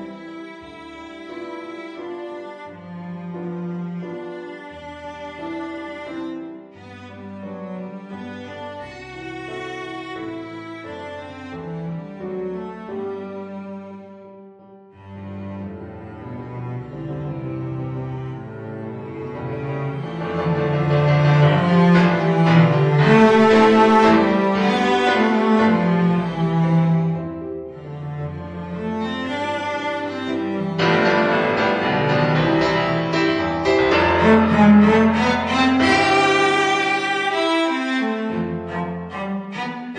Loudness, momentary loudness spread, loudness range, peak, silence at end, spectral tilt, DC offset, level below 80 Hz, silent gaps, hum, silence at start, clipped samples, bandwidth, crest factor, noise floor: -18 LUFS; 20 LU; 18 LU; -2 dBFS; 0 s; -7 dB/octave; under 0.1%; -50 dBFS; none; none; 0 s; under 0.1%; 9.8 kHz; 18 dB; -45 dBFS